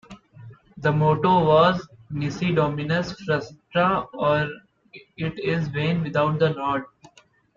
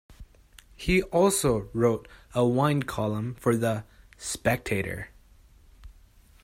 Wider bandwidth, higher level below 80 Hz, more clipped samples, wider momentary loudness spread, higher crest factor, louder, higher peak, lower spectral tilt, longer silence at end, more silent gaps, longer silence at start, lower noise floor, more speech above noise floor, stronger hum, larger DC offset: second, 7.2 kHz vs 16 kHz; second, -54 dBFS vs -46 dBFS; neither; about the same, 12 LU vs 12 LU; about the same, 20 dB vs 20 dB; first, -23 LUFS vs -26 LUFS; first, -4 dBFS vs -8 dBFS; first, -7.5 dB/octave vs -5.5 dB/octave; first, 0.7 s vs 0.5 s; neither; about the same, 0.1 s vs 0.1 s; second, -46 dBFS vs -55 dBFS; second, 24 dB vs 30 dB; neither; neither